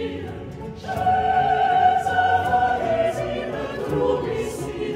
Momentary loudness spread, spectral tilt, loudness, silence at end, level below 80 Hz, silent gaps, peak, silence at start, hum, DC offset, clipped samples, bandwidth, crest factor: 13 LU; -5.5 dB/octave; -21 LUFS; 0 s; -44 dBFS; none; -6 dBFS; 0 s; none; under 0.1%; under 0.1%; 15 kHz; 16 dB